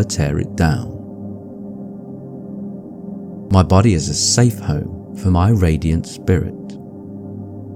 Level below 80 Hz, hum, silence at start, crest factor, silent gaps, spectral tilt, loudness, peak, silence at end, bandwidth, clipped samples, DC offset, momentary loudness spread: -32 dBFS; none; 0 s; 18 dB; none; -5.5 dB/octave; -17 LUFS; 0 dBFS; 0 s; 15 kHz; under 0.1%; under 0.1%; 19 LU